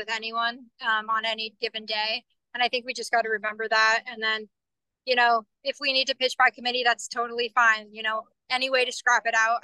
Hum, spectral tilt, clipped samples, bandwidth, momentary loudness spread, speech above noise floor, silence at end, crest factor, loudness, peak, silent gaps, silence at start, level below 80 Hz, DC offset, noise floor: none; 0 dB/octave; under 0.1%; 12.5 kHz; 9 LU; 61 dB; 0.05 s; 18 dB; -25 LUFS; -8 dBFS; none; 0 s; -84 dBFS; under 0.1%; -86 dBFS